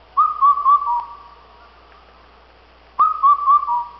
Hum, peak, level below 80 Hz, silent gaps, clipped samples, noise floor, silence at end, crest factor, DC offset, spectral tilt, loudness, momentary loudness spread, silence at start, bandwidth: none; -6 dBFS; -54 dBFS; none; under 0.1%; -49 dBFS; 0.1 s; 12 dB; under 0.1%; -5 dB/octave; -16 LUFS; 11 LU; 0.15 s; 5.6 kHz